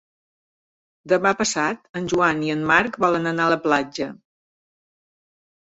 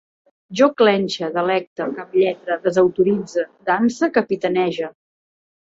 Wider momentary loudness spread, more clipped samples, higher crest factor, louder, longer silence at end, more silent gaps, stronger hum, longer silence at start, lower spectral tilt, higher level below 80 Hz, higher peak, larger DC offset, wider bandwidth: about the same, 10 LU vs 10 LU; neither; about the same, 20 dB vs 18 dB; about the same, -21 LUFS vs -19 LUFS; first, 1.6 s vs 0.85 s; about the same, 1.89-1.94 s vs 1.67-1.76 s; neither; first, 1.05 s vs 0.5 s; second, -4 dB/octave vs -5.5 dB/octave; first, -58 dBFS vs -64 dBFS; about the same, -2 dBFS vs -2 dBFS; neither; about the same, 8.4 kHz vs 7.8 kHz